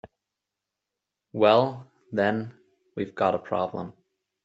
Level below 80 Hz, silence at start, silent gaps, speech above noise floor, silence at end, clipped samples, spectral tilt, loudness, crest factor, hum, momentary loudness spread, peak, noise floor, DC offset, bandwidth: -70 dBFS; 0.05 s; none; 62 dB; 0.55 s; under 0.1%; -4 dB/octave; -25 LUFS; 24 dB; none; 21 LU; -4 dBFS; -86 dBFS; under 0.1%; 7.8 kHz